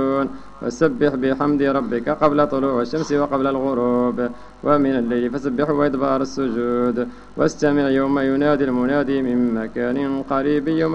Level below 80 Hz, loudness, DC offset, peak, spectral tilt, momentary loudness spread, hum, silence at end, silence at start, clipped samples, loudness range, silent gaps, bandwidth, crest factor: -48 dBFS; -20 LUFS; under 0.1%; -4 dBFS; -7 dB/octave; 5 LU; none; 0 s; 0 s; under 0.1%; 1 LU; none; 8.2 kHz; 16 dB